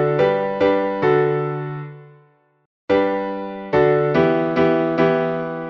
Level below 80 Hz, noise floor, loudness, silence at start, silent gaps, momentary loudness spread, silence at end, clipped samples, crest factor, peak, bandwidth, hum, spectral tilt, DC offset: -54 dBFS; -55 dBFS; -19 LUFS; 0 s; 2.66-2.88 s; 10 LU; 0 s; under 0.1%; 16 dB; -4 dBFS; 6.2 kHz; none; -5.5 dB/octave; under 0.1%